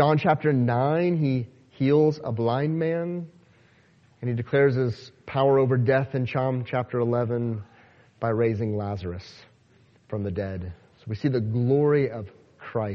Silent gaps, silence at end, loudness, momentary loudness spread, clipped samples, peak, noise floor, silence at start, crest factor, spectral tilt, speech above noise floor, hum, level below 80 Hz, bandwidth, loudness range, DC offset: none; 0 s; -25 LUFS; 15 LU; under 0.1%; -6 dBFS; -59 dBFS; 0 s; 18 dB; -9.5 dB/octave; 35 dB; none; -58 dBFS; 6.4 kHz; 6 LU; under 0.1%